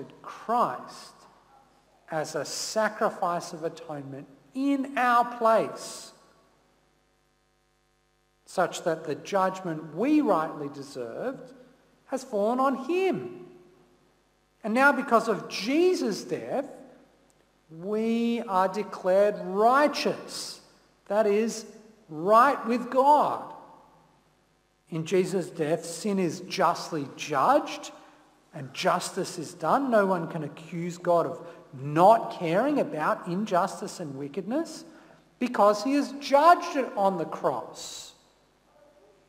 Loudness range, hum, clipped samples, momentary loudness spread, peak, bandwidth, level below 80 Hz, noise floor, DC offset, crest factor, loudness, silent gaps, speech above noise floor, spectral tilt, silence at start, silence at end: 6 LU; none; under 0.1%; 18 LU; -6 dBFS; 16 kHz; -74 dBFS; -69 dBFS; under 0.1%; 20 dB; -26 LUFS; none; 43 dB; -5 dB/octave; 0 s; 1.2 s